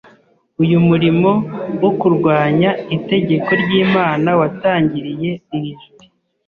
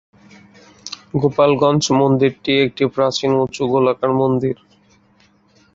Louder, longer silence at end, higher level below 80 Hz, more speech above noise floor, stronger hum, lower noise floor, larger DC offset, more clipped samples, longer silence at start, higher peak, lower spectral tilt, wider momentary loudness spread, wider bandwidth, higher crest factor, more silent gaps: about the same, -15 LUFS vs -17 LUFS; second, 0.7 s vs 1.2 s; about the same, -52 dBFS vs -54 dBFS; about the same, 36 dB vs 39 dB; neither; second, -51 dBFS vs -55 dBFS; neither; neither; second, 0.6 s vs 0.85 s; about the same, -2 dBFS vs -2 dBFS; first, -9.5 dB/octave vs -5.5 dB/octave; about the same, 10 LU vs 10 LU; second, 4.8 kHz vs 7.8 kHz; about the same, 12 dB vs 16 dB; neither